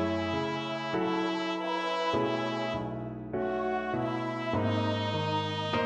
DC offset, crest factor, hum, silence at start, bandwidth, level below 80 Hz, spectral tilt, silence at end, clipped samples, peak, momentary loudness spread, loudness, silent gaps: under 0.1%; 14 dB; none; 0 s; 9.4 kHz; -60 dBFS; -6 dB/octave; 0 s; under 0.1%; -16 dBFS; 4 LU; -31 LUFS; none